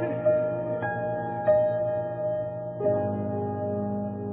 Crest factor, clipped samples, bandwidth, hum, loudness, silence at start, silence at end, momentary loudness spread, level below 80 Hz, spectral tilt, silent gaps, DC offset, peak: 14 dB; under 0.1%; 3.7 kHz; none; -28 LUFS; 0 s; 0 s; 7 LU; -62 dBFS; -12 dB/octave; none; under 0.1%; -12 dBFS